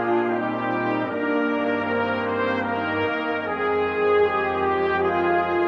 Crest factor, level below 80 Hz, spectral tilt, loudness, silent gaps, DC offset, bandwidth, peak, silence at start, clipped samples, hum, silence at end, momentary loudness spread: 14 dB; -58 dBFS; -7.5 dB/octave; -23 LUFS; none; under 0.1%; 6.2 kHz; -10 dBFS; 0 s; under 0.1%; none; 0 s; 4 LU